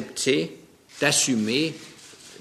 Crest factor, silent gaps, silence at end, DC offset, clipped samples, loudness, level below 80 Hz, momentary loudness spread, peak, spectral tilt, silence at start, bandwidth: 22 dB; none; 0.05 s; under 0.1%; under 0.1%; -23 LUFS; -66 dBFS; 23 LU; -4 dBFS; -2.5 dB/octave; 0 s; 14 kHz